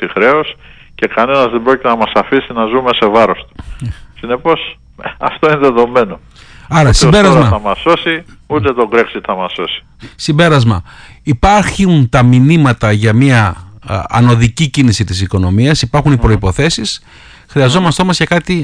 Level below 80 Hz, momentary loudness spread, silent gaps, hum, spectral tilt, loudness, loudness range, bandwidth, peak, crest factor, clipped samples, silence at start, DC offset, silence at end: -28 dBFS; 12 LU; none; none; -6 dB/octave; -11 LUFS; 4 LU; 10.5 kHz; 0 dBFS; 10 dB; under 0.1%; 0 s; under 0.1%; 0 s